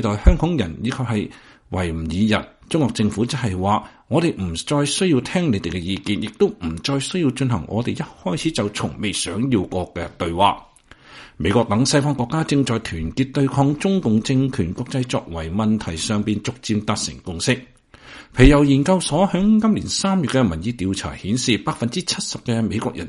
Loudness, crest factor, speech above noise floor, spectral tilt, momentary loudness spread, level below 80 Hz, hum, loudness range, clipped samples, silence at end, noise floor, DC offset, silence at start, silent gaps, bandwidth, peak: -20 LUFS; 20 dB; 26 dB; -5.5 dB/octave; 8 LU; -32 dBFS; none; 5 LU; under 0.1%; 0 s; -45 dBFS; under 0.1%; 0 s; none; 11.5 kHz; 0 dBFS